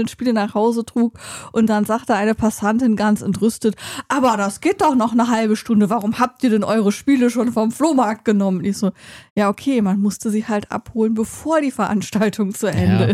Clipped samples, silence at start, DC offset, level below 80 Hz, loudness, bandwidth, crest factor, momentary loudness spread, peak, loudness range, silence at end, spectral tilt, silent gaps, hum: under 0.1%; 0 s; under 0.1%; -52 dBFS; -18 LUFS; 15 kHz; 14 dB; 6 LU; -4 dBFS; 3 LU; 0 s; -6 dB/octave; 9.30-9.36 s; none